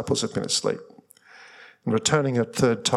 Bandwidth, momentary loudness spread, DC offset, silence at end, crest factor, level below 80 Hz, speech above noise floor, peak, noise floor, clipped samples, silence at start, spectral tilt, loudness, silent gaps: 14.5 kHz; 9 LU; under 0.1%; 0 s; 20 dB; -60 dBFS; 27 dB; -6 dBFS; -51 dBFS; under 0.1%; 0 s; -4 dB/octave; -24 LUFS; none